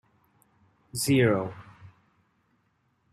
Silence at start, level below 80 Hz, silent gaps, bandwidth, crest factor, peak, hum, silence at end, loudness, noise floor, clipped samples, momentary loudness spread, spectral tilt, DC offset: 0.95 s; -64 dBFS; none; 15 kHz; 20 dB; -10 dBFS; none; 1.25 s; -26 LUFS; -71 dBFS; under 0.1%; 17 LU; -5.5 dB/octave; under 0.1%